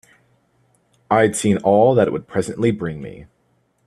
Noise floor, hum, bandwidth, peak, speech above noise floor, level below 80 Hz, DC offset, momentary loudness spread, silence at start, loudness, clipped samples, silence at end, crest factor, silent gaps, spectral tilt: -64 dBFS; none; 13 kHz; 0 dBFS; 46 dB; -54 dBFS; under 0.1%; 14 LU; 1.1 s; -18 LUFS; under 0.1%; 0.6 s; 18 dB; none; -6 dB/octave